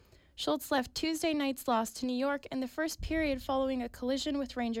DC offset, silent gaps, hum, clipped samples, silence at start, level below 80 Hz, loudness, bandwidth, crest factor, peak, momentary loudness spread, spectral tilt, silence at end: under 0.1%; none; none; under 0.1%; 0.35 s; -52 dBFS; -33 LUFS; 16.5 kHz; 12 dB; -20 dBFS; 4 LU; -4 dB/octave; 0 s